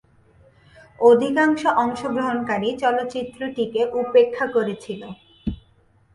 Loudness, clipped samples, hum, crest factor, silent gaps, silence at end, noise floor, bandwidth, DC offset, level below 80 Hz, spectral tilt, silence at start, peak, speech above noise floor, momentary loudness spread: -21 LUFS; under 0.1%; none; 18 dB; none; 0.6 s; -58 dBFS; 11 kHz; under 0.1%; -50 dBFS; -6 dB/octave; 1 s; -4 dBFS; 38 dB; 16 LU